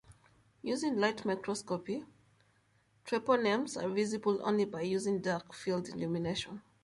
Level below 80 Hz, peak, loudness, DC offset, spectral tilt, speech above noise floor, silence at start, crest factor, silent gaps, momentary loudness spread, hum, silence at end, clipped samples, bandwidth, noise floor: -70 dBFS; -16 dBFS; -34 LUFS; under 0.1%; -5 dB/octave; 37 dB; 0.1 s; 18 dB; none; 8 LU; none; 0.25 s; under 0.1%; 11.5 kHz; -71 dBFS